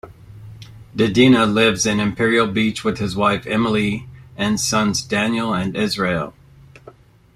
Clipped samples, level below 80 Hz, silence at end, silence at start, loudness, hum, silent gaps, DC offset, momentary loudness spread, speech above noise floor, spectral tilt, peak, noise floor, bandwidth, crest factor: under 0.1%; -48 dBFS; 0.45 s; 0.05 s; -18 LUFS; none; none; under 0.1%; 12 LU; 28 dB; -4.5 dB/octave; -2 dBFS; -46 dBFS; 14 kHz; 18 dB